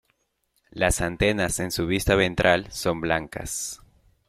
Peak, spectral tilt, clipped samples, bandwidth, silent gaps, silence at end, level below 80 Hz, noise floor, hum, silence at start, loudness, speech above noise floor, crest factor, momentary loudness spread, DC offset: -2 dBFS; -4 dB/octave; under 0.1%; 16.5 kHz; none; 0.5 s; -40 dBFS; -72 dBFS; none; 0.75 s; -24 LUFS; 48 dB; 22 dB; 10 LU; under 0.1%